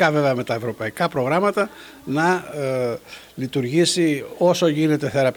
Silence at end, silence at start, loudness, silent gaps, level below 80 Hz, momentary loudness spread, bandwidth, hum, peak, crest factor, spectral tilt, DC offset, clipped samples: 0 s; 0 s; -21 LUFS; none; -60 dBFS; 9 LU; over 20 kHz; none; -2 dBFS; 18 dB; -5 dB/octave; under 0.1%; under 0.1%